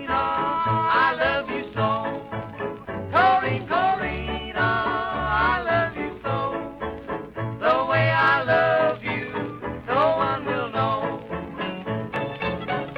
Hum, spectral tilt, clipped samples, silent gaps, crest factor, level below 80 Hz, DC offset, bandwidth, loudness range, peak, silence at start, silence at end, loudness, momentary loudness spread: none; -7.5 dB/octave; under 0.1%; none; 16 dB; -46 dBFS; under 0.1%; 6 kHz; 4 LU; -8 dBFS; 0 s; 0 s; -23 LUFS; 12 LU